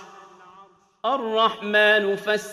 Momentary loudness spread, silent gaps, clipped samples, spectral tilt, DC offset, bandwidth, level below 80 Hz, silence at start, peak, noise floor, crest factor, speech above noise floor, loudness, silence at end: 9 LU; none; under 0.1%; -3.5 dB/octave; under 0.1%; 14 kHz; -74 dBFS; 0 s; -6 dBFS; -52 dBFS; 18 dB; 31 dB; -21 LUFS; 0 s